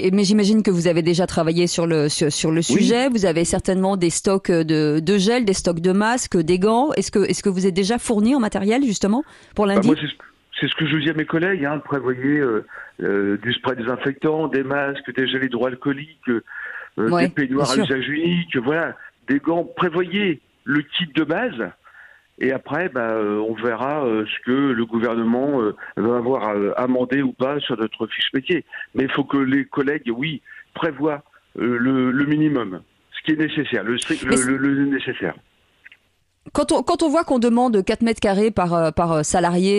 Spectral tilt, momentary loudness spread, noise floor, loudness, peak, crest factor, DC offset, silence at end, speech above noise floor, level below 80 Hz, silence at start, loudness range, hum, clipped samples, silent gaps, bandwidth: -5 dB/octave; 8 LU; -64 dBFS; -20 LUFS; -4 dBFS; 16 dB; under 0.1%; 0 s; 45 dB; -50 dBFS; 0 s; 4 LU; none; under 0.1%; none; 12 kHz